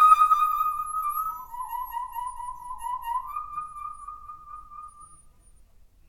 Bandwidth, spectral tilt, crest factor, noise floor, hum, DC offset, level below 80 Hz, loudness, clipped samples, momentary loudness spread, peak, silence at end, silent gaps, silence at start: 17.5 kHz; -0.5 dB/octave; 22 dB; -54 dBFS; none; under 0.1%; -54 dBFS; -27 LUFS; under 0.1%; 22 LU; -6 dBFS; 0.95 s; none; 0 s